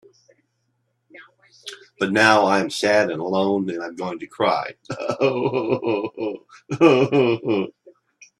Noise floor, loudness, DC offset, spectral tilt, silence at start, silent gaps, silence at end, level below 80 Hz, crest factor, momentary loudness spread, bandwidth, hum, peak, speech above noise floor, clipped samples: -71 dBFS; -20 LUFS; under 0.1%; -5.5 dB/octave; 1.15 s; none; 0.7 s; -64 dBFS; 22 dB; 17 LU; 12.5 kHz; none; 0 dBFS; 51 dB; under 0.1%